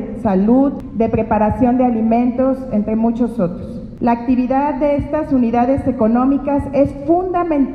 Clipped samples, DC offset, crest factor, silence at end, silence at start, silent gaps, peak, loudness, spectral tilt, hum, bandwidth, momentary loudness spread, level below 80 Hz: under 0.1%; under 0.1%; 14 dB; 0 s; 0 s; none; -2 dBFS; -16 LUFS; -10 dB/octave; none; 5 kHz; 5 LU; -36 dBFS